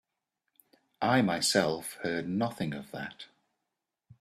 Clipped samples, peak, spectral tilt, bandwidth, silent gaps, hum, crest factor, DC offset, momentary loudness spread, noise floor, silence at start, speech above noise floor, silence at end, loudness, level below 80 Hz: under 0.1%; -10 dBFS; -4 dB/octave; 15 kHz; none; none; 22 dB; under 0.1%; 16 LU; -86 dBFS; 1 s; 56 dB; 0.1 s; -30 LUFS; -70 dBFS